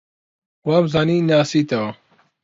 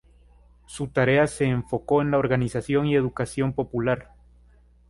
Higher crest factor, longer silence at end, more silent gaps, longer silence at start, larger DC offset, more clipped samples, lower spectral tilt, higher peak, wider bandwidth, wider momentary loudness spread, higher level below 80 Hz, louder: about the same, 16 dB vs 18 dB; second, 0.5 s vs 0.85 s; neither; about the same, 0.65 s vs 0.7 s; neither; neither; about the same, -6.5 dB/octave vs -6.5 dB/octave; first, -4 dBFS vs -8 dBFS; second, 7.8 kHz vs 11.5 kHz; first, 10 LU vs 7 LU; second, -56 dBFS vs -50 dBFS; first, -18 LUFS vs -24 LUFS